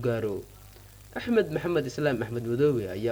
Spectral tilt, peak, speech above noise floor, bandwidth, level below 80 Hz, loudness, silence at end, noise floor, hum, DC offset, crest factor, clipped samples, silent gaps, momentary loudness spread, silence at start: -7 dB/octave; -10 dBFS; 22 dB; over 20 kHz; -54 dBFS; -28 LUFS; 0 s; -49 dBFS; 50 Hz at -50 dBFS; under 0.1%; 18 dB; under 0.1%; none; 12 LU; 0 s